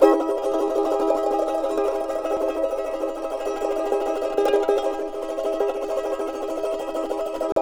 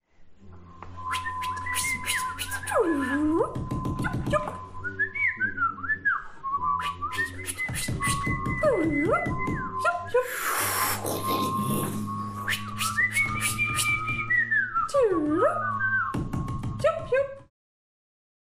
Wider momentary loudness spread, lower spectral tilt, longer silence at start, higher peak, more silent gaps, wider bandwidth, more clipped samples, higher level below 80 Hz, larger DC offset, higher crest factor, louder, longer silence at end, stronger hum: about the same, 6 LU vs 8 LU; about the same, -4 dB/octave vs -4 dB/octave; second, 0 s vs 0.2 s; first, -2 dBFS vs -12 dBFS; first, 7.52-7.56 s vs none; first, 18.5 kHz vs 16 kHz; neither; about the same, -50 dBFS vs -46 dBFS; second, under 0.1% vs 0.1%; about the same, 20 dB vs 16 dB; first, -24 LUFS vs -27 LUFS; second, 0 s vs 1 s; neither